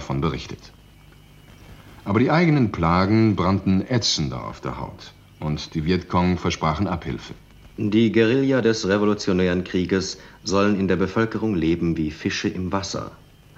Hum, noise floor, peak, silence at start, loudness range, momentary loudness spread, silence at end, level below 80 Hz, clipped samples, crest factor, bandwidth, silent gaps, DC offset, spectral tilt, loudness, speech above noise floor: none; -48 dBFS; -4 dBFS; 0 s; 4 LU; 14 LU; 0.45 s; -44 dBFS; under 0.1%; 18 dB; 8 kHz; none; under 0.1%; -6 dB/octave; -22 LUFS; 27 dB